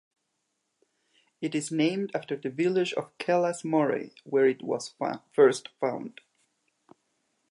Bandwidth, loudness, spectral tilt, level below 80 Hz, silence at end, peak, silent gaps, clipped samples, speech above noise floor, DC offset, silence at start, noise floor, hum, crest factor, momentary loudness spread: 11.5 kHz; -28 LUFS; -5 dB/octave; -82 dBFS; 1.4 s; -8 dBFS; none; under 0.1%; 52 dB; under 0.1%; 1.4 s; -79 dBFS; none; 20 dB; 11 LU